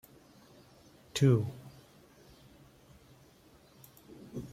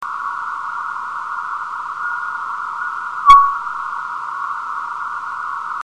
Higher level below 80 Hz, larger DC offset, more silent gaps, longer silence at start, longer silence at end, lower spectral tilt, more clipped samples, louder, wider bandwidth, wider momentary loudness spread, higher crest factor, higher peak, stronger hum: second, -66 dBFS vs -46 dBFS; neither; neither; first, 1.15 s vs 0 s; about the same, 0 s vs 0.1 s; first, -6.5 dB/octave vs -1 dB/octave; second, under 0.1% vs 0.1%; second, -31 LUFS vs -19 LUFS; first, 15.5 kHz vs 10.5 kHz; first, 29 LU vs 15 LU; about the same, 22 dB vs 20 dB; second, -14 dBFS vs 0 dBFS; neither